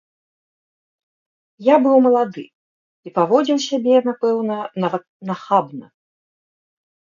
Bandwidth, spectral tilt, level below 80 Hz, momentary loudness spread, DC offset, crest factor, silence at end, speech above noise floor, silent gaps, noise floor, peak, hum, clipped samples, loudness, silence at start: 7.4 kHz; -6 dB/octave; -74 dBFS; 15 LU; under 0.1%; 18 dB; 1.2 s; over 73 dB; 2.55-3.03 s, 5.09-5.20 s; under -90 dBFS; -2 dBFS; none; under 0.1%; -18 LUFS; 1.6 s